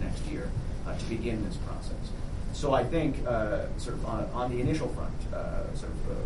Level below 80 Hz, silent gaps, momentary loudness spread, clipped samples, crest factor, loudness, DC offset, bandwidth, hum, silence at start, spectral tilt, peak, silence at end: -36 dBFS; none; 9 LU; under 0.1%; 18 dB; -33 LUFS; 0.3%; 11.5 kHz; none; 0 s; -7 dB/octave; -12 dBFS; 0 s